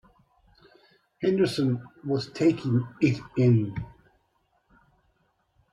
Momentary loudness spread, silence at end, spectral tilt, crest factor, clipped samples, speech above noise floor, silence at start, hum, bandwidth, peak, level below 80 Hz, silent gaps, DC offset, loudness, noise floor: 10 LU; 1.85 s; -7.5 dB/octave; 18 dB; under 0.1%; 46 dB; 1.2 s; none; 11.5 kHz; -10 dBFS; -60 dBFS; none; under 0.1%; -26 LUFS; -71 dBFS